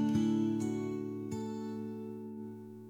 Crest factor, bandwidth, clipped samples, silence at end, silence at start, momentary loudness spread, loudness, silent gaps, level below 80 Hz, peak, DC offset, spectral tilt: 14 dB; 12 kHz; under 0.1%; 0 s; 0 s; 14 LU; -37 LUFS; none; -72 dBFS; -22 dBFS; under 0.1%; -7.5 dB/octave